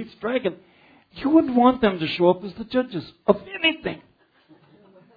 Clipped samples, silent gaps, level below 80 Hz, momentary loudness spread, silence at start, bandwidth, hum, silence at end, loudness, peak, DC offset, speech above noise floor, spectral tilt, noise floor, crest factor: under 0.1%; none; -56 dBFS; 12 LU; 0 s; 5 kHz; none; 1.2 s; -22 LUFS; -2 dBFS; under 0.1%; 35 dB; -8 dB/octave; -56 dBFS; 22 dB